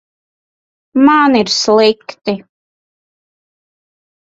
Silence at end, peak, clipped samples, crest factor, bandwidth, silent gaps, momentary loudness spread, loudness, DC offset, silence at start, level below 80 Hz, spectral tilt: 1.9 s; 0 dBFS; under 0.1%; 16 dB; 8 kHz; none; 12 LU; -12 LUFS; under 0.1%; 0.95 s; -58 dBFS; -3.5 dB/octave